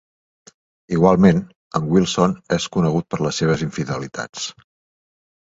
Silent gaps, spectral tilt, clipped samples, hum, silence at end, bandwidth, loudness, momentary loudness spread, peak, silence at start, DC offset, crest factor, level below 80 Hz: 1.56-1.71 s, 4.29-4.33 s; -6 dB/octave; under 0.1%; none; 0.95 s; 7.8 kHz; -19 LUFS; 13 LU; 0 dBFS; 0.9 s; under 0.1%; 20 dB; -48 dBFS